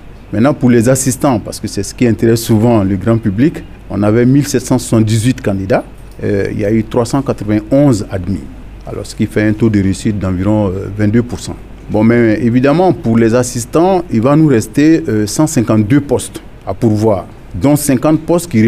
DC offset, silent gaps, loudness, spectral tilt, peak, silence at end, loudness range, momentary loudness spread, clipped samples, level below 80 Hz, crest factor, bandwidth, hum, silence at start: under 0.1%; none; -12 LUFS; -6.5 dB/octave; 0 dBFS; 0 s; 4 LU; 12 LU; under 0.1%; -34 dBFS; 10 dB; 15.5 kHz; none; 0.05 s